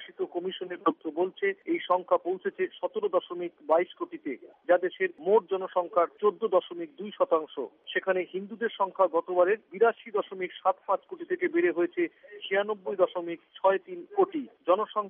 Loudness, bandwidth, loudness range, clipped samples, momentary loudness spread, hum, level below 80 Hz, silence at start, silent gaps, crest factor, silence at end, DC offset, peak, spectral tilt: -29 LUFS; 3.7 kHz; 2 LU; under 0.1%; 11 LU; none; -88 dBFS; 0 s; none; 18 dB; 0 s; under 0.1%; -10 dBFS; -2.5 dB/octave